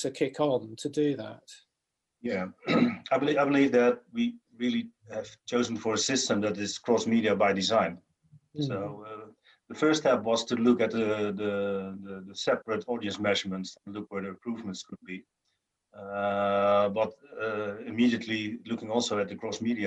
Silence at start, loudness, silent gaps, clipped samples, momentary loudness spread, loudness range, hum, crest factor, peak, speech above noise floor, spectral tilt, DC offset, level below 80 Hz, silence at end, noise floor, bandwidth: 0 s; -29 LUFS; none; under 0.1%; 15 LU; 5 LU; none; 18 dB; -10 dBFS; 56 dB; -4.5 dB/octave; under 0.1%; -70 dBFS; 0 s; -84 dBFS; 10.5 kHz